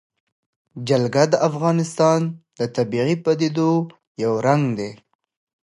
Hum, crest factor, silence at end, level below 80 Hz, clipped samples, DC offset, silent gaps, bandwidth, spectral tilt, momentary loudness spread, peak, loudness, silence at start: none; 18 dB; 0.7 s; -64 dBFS; under 0.1%; under 0.1%; 4.07-4.15 s; 11.5 kHz; -6.5 dB/octave; 10 LU; -4 dBFS; -20 LUFS; 0.75 s